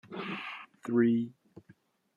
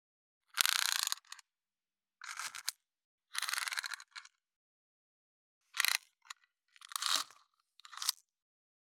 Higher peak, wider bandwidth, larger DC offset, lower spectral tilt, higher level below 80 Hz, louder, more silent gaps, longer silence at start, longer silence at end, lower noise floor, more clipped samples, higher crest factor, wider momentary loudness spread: second, -16 dBFS vs -2 dBFS; second, 7.2 kHz vs over 20 kHz; neither; first, -7.5 dB/octave vs 4.5 dB/octave; first, -78 dBFS vs -90 dBFS; first, -32 LUFS vs -36 LUFS; second, none vs 3.04-3.18 s, 4.56-5.61 s; second, 0.1 s vs 0.55 s; about the same, 0.85 s vs 0.8 s; second, -63 dBFS vs under -90 dBFS; neither; second, 18 dB vs 40 dB; second, 15 LU vs 22 LU